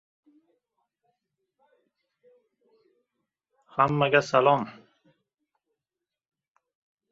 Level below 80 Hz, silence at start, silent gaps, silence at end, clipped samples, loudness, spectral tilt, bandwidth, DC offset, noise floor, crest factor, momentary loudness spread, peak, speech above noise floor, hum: -72 dBFS; 3.75 s; none; 2.4 s; under 0.1%; -23 LUFS; -6 dB/octave; 7.8 kHz; under 0.1%; -89 dBFS; 26 dB; 13 LU; -6 dBFS; 67 dB; none